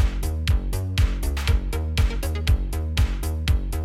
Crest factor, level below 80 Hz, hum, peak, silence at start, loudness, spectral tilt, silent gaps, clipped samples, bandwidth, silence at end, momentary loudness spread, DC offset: 14 dB; -24 dBFS; none; -8 dBFS; 0 s; -25 LUFS; -5.5 dB/octave; none; under 0.1%; 15.5 kHz; 0 s; 3 LU; under 0.1%